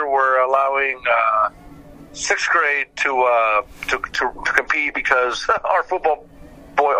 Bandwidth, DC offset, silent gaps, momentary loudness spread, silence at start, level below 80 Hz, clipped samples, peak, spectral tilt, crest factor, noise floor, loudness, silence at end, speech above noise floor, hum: 15 kHz; under 0.1%; none; 7 LU; 0 s; -48 dBFS; under 0.1%; 0 dBFS; -1.5 dB/octave; 20 dB; -41 dBFS; -18 LUFS; 0 s; 22 dB; none